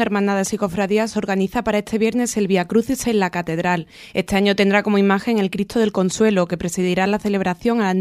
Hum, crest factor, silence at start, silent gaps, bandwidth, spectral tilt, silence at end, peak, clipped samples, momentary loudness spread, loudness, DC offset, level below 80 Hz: none; 16 dB; 0 s; none; 15 kHz; -5.5 dB/octave; 0 s; -4 dBFS; under 0.1%; 5 LU; -19 LUFS; under 0.1%; -48 dBFS